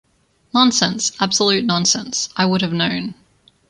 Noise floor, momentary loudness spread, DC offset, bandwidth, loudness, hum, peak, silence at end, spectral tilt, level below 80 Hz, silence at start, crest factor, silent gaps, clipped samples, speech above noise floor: -57 dBFS; 7 LU; under 0.1%; 11 kHz; -17 LUFS; none; -2 dBFS; 0.55 s; -3 dB/octave; -56 dBFS; 0.55 s; 18 dB; none; under 0.1%; 40 dB